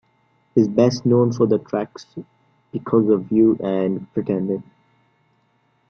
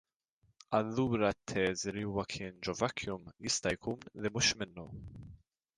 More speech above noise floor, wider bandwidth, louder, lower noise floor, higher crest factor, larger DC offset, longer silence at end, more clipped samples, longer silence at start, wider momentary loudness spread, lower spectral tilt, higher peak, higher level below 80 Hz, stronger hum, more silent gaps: first, 45 dB vs 39 dB; second, 6.8 kHz vs 11 kHz; first, -19 LUFS vs -35 LUFS; second, -64 dBFS vs -75 dBFS; about the same, 18 dB vs 22 dB; neither; first, 1.25 s vs 0.4 s; neither; second, 0.55 s vs 0.7 s; about the same, 15 LU vs 14 LU; first, -8 dB/octave vs -3.5 dB/octave; first, -2 dBFS vs -16 dBFS; about the same, -58 dBFS vs -60 dBFS; neither; neither